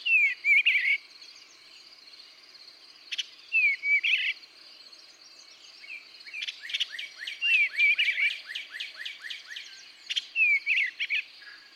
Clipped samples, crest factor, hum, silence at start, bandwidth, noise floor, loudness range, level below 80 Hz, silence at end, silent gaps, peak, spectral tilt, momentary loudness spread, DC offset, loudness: under 0.1%; 16 dB; none; 0 s; 14.5 kHz; -52 dBFS; 4 LU; under -90 dBFS; 0.2 s; none; -14 dBFS; 4 dB/octave; 21 LU; under 0.1%; -25 LUFS